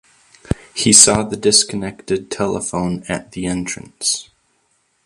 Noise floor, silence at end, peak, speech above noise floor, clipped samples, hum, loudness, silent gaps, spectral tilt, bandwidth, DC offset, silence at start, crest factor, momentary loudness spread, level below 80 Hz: -63 dBFS; 0.85 s; 0 dBFS; 46 dB; under 0.1%; none; -16 LUFS; none; -2.5 dB/octave; 16 kHz; under 0.1%; 0.5 s; 18 dB; 18 LU; -42 dBFS